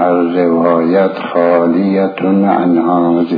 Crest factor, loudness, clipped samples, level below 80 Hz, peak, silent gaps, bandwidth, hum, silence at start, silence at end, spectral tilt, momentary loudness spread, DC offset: 12 dB; -12 LUFS; under 0.1%; -60 dBFS; 0 dBFS; none; 5 kHz; none; 0 s; 0 s; -10.5 dB/octave; 3 LU; under 0.1%